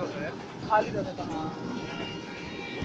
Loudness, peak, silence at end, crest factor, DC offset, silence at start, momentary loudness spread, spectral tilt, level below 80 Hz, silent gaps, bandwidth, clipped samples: -32 LUFS; -12 dBFS; 0 s; 22 dB; under 0.1%; 0 s; 11 LU; -5.5 dB/octave; -58 dBFS; none; 8.6 kHz; under 0.1%